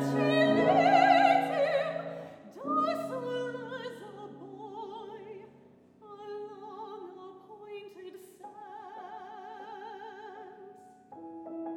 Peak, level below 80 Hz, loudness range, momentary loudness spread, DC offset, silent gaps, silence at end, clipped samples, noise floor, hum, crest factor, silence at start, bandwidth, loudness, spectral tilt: -10 dBFS; -80 dBFS; 19 LU; 25 LU; under 0.1%; none; 0 s; under 0.1%; -58 dBFS; none; 22 dB; 0 s; 14.5 kHz; -27 LUFS; -6 dB/octave